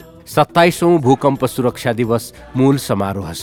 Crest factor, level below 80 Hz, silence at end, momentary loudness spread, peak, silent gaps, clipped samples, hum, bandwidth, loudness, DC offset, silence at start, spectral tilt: 16 dB; -48 dBFS; 0 s; 8 LU; 0 dBFS; none; under 0.1%; none; 18.5 kHz; -16 LUFS; under 0.1%; 0 s; -6 dB/octave